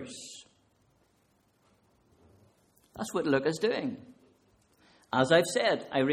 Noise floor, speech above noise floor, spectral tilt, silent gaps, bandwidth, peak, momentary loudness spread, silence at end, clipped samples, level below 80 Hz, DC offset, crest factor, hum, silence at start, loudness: -70 dBFS; 41 dB; -4.5 dB/octave; none; 15 kHz; -10 dBFS; 22 LU; 0 s; under 0.1%; -70 dBFS; under 0.1%; 22 dB; none; 0 s; -29 LUFS